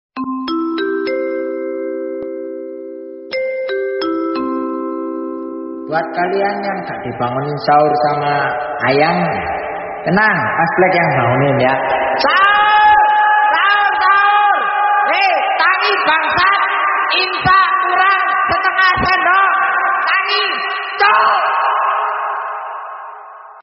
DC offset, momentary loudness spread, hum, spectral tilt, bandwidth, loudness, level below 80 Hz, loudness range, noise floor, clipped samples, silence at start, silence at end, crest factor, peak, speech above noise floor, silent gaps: under 0.1%; 13 LU; none; -2 dB/octave; 6 kHz; -14 LUFS; -48 dBFS; 10 LU; -35 dBFS; under 0.1%; 0.15 s; 0 s; 14 dB; 0 dBFS; 20 dB; none